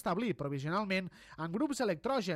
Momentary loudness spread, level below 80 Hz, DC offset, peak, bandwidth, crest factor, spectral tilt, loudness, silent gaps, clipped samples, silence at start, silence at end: 7 LU; -66 dBFS; under 0.1%; -20 dBFS; 15.5 kHz; 14 dB; -5.5 dB/octave; -35 LUFS; none; under 0.1%; 0.05 s; 0 s